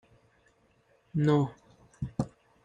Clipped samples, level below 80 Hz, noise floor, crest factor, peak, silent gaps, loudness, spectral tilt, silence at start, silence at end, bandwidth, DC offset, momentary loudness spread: under 0.1%; -58 dBFS; -67 dBFS; 20 dB; -14 dBFS; none; -31 LUFS; -8.5 dB/octave; 1.15 s; 0.35 s; 9.4 kHz; under 0.1%; 13 LU